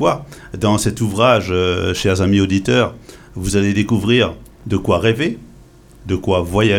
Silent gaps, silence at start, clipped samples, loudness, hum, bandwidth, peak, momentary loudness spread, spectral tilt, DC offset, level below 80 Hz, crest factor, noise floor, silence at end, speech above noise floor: none; 0 s; under 0.1%; -17 LUFS; none; 16.5 kHz; 0 dBFS; 10 LU; -5.5 dB/octave; under 0.1%; -38 dBFS; 16 dB; -43 dBFS; 0 s; 27 dB